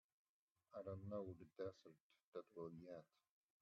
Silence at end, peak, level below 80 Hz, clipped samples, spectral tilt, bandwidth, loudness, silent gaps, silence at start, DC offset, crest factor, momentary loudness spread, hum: 0.55 s; -38 dBFS; -86 dBFS; under 0.1%; -8 dB/octave; 6.6 kHz; -56 LUFS; 2.00-2.10 s, 2.24-2.32 s; 0.7 s; under 0.1%; 18 dB; 9 LU; none